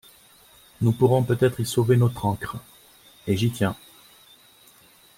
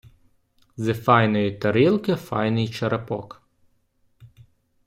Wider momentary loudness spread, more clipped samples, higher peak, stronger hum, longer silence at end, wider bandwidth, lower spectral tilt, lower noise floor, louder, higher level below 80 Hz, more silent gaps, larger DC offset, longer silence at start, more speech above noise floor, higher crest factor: first, 15 LU vs 12 LU; neither; about the same, -6 dBFS vs -4 dBFS; neither; first, 1.4 s vs 0.6 s; about the same, 16.5 kHz vs 15.5 kHz; about the same, -7 dB/octave vs -7.5 dB/octave; second, -54 dBFS vs -65 dBFS; about the same, -23 LUFS vs -22 LUFS; about the same, -56 dBFS vs -58 dBFS; neither; neither; about the same, 0.8 s vs 0.8 s; second, 32 dB vs 44 dB; about the same, 18 dB vs 20 dB